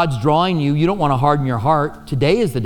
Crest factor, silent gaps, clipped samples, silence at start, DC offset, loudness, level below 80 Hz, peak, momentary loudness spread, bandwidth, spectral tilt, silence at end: 14 dB; none; under 0.1%; 0 s; under 0.1%; -17 LUFS; -40 dBFS; -2 dBFS; 3 LU; 17 kHz; -7.5 dB/octave; 0 s